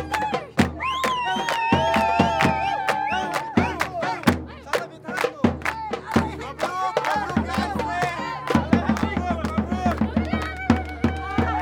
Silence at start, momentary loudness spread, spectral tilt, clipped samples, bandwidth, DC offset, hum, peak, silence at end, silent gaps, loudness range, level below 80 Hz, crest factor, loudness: 0 s; 7 LU; -5.5 dB/octave; under 0.1%; 18 kHz; under 0.1%; none; -2 dBFS; 0 s; none; 3 LU; -42 dBFS; 20 dB; -23 LUFS